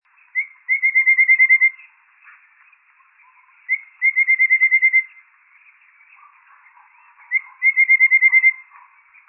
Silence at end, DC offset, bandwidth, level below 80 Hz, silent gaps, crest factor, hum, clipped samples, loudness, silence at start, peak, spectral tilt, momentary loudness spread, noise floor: 0.65 s; under 0.1%; 2.9 kHz; under -90 dBFS; none; 14 dB; none; under 0.1%; -14 LUFS; 0.35 s; -6 dBFS; 3.5 dB/octave; 14 LU; -55 dBFS